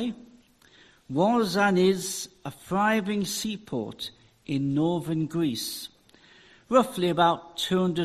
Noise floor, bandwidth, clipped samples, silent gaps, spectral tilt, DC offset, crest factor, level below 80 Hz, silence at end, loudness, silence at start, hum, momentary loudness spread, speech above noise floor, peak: -57 dBFS; 14 kHz; under 0.1%; none; -5 dB/octave; under 0.1%; 20 dB; -62 dBFS; 0 s; -26 LUFS; 0 s; none; 15 LU; 31 dB; -8 dBFS